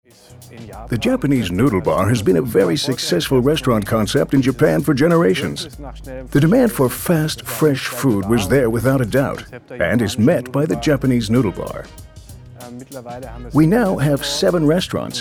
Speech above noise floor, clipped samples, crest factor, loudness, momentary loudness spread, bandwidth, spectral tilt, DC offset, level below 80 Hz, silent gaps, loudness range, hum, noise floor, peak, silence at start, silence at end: 21 dB; under 0.1%; 14 dB; -17 LUFS; 18 LU; 19.5 kHz; -6 dB/octave; under 0.1%; -40 dBFS; none; 4 LU; none; -38 dBFS; -4 dBFS; 0.3 s; 0 s